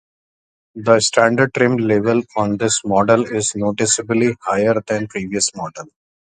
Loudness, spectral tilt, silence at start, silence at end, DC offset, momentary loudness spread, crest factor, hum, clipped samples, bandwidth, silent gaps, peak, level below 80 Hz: -17 LUFS; -4 dB/octave; 0.75 s; 0.45 s; under 0.1%; 8 LU; 18 dB; none; under 0.1%; 10 kHz; none; 0 dBFS; -54 dBFS